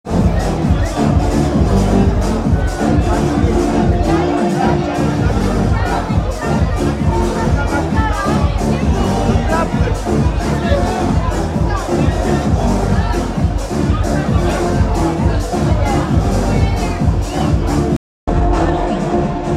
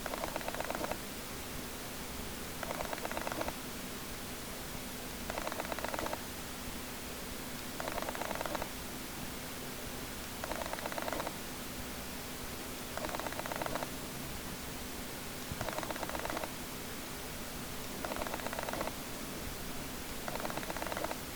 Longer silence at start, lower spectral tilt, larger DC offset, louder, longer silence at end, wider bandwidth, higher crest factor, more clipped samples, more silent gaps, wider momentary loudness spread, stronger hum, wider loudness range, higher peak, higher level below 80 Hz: about the same, 0.05 s vs 0 s; first, -7 dB/octave vs -3 dB/octave; second, under 0.1% vs 0.2%; first, -16 LUFS vs -40 LUFS; about the same, 0 s vs 0 s; second, 13.5 kHz vs over 20 kHz; second, 14 dB vs 20 dB; neither; first, 17.97-18.27 s vs none; about the same, 3 LU vs 4 LU; neither; about the same, 2 LU vs 1 LU; first, 0 dBFS vs -20 dBFS; first, -20 dBFS vs -52 dBFS